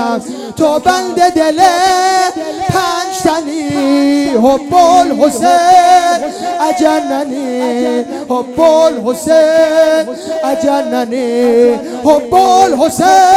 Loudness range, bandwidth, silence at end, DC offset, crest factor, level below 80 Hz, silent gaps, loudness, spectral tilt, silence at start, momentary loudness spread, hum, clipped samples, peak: 2 LU; 15.5 kHz; 0 s; under 0.1%; 10 dB; -46 dBFS; none; -11 LUFS; -4 dB/octave; 0 s; 9 LU; none; 0.8%; 0 dBFS